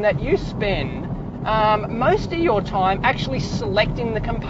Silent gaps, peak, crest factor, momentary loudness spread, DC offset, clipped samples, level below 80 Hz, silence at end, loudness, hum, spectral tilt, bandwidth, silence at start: none; -4 dBFS; 16 dB; 6 LU; under 0.1%; under 0.1%; -34 dBFS; 0 s; -21 LUFS; none; -6.5 dB/octave; 8 kHz; 0 s